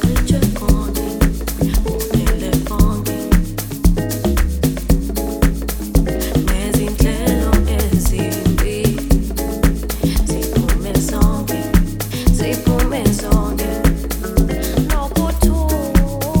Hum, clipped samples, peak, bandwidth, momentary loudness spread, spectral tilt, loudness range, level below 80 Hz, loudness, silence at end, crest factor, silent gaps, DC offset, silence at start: none; under 0.1%; 0 dBFS; 17.5 kHz; 3 LU; -6 dB/octave; 1 LU; -18 dBFS; -18 LUFS; 0 s; 16 dB; none; under 0.1%; 0 s